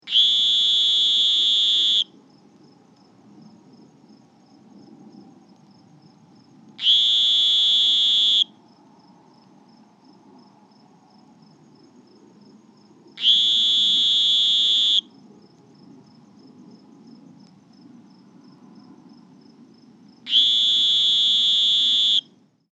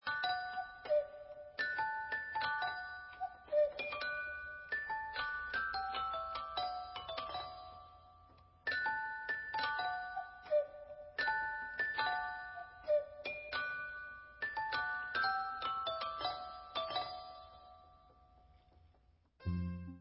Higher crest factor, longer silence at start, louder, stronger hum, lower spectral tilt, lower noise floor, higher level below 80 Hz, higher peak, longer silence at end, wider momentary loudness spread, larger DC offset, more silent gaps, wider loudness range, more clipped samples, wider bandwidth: about the same, 18 dB vs 18 dB; about the same, 0.05 s vs 0.05 s; first, -16 LUFS vs -39 LUFS; neither; second, 0.5 dB/octave vs -1 dB/octave; second, -55 dBFS vs -70 dBFS; second, -90 dBFS vs -62 dBFS; first, -6 dBFS vs -22 dBFS; first, 0.55 s vs 0 s; second, 4 LU vs 11 LU; neither; neither; first, 8 LU vs 4 LU; neither; first, 8.4 kHz vs 5.6 kHz